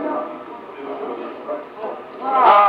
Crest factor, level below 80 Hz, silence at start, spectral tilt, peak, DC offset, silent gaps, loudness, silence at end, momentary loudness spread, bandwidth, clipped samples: 20 dB; -70 dBFS; 0 s; -6 dB/octave; 0 dBFS; under 0.1%; none; -23 LUFS; 0 s; 17 LU; 5.6 kHz; under 0.1%